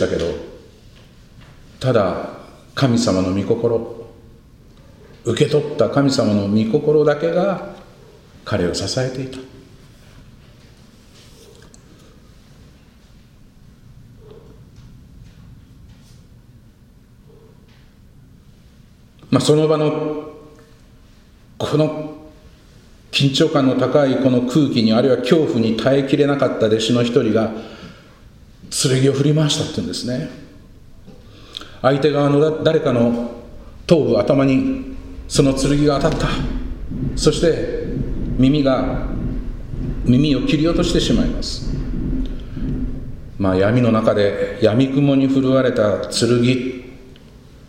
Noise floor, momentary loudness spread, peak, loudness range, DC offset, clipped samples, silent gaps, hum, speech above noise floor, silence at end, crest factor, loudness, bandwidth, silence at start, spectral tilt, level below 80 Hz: -47 dBFS; 15 LU; 0 dBFS; 6 LU; under 0.1%; under 0.1%; none; none; 31 dB; 0.3 s; 20 dB; -18 LUFS; 14.5 kHz; 0 s; -6 dB/octave; -34 dBFS